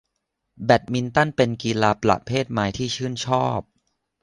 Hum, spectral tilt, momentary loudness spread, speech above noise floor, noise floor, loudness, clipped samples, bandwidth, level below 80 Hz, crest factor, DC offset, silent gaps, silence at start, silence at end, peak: none; -5.5 dB/octave; 7 LU; 56 dB; -77 dBFS; -22 LUFS; under 0.1%; 10.5 kHz; -50 dBFS; 20 dB; under 0.1%; none; 0.6 s; 0.6 s; -2 dBFS